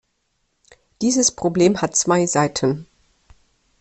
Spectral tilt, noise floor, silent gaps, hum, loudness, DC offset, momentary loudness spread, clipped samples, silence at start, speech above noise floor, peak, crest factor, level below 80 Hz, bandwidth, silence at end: -4 dB/octave; -70 dBFS; none; none; -19 LUFS; under 0.1%; 6 LU; under 0.1%; 1 s; 51 dB; -4 dBFS; 18 dB; -56 dBFS; 8.8 kHz; 0.95 s